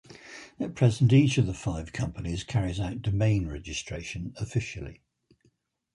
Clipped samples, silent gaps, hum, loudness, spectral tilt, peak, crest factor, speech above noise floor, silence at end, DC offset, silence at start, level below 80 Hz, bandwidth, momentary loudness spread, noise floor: under 0.1%; none; none; -28 LUFS; -6.5 dB/octave; -8 dBFS; 20 dB; 43 dB; 1.05 s; under 0.1%; 0.1 s; -46 dBFS; 11 kHz; 17 LU; -69 dBFS